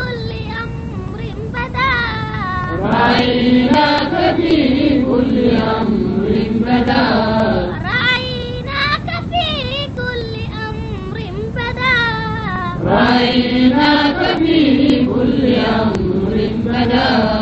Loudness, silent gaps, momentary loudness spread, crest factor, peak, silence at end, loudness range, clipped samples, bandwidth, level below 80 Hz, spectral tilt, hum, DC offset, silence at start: -15 LUFS; none; 11 LU; 14 dB; 0 dBFS; 0 s; 6 LU; under 0.1%; 8 kHz; -32 dBFS; -7 dB/octave; none; 0.2%; 0 s